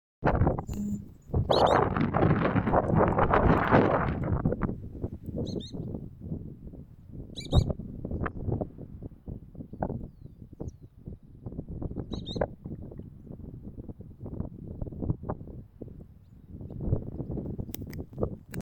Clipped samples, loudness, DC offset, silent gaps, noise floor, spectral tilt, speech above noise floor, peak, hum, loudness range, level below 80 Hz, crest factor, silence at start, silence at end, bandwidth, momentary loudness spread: under 0.1%; -30 LUFS; under 0.1%; none; -51 dBFS; -7.5 dB/octave; 25 dB; -8 dBFS; none; 15 LU; -40 dBFS; 22 dB; 0.2 s; 0 s; 18 kHz; 22 LU